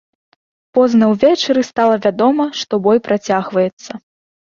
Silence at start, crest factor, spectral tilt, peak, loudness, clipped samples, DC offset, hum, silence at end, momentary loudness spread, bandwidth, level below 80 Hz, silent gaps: 0.75 s; 14 dB; -5.5 dB/octave; -2 dBFS; -15 LUFS; under 0.1%; under 0.1%; none; 0.6 s; 8 LU; 7.4 kHz; -58 dBFS; 3.73-3.77 s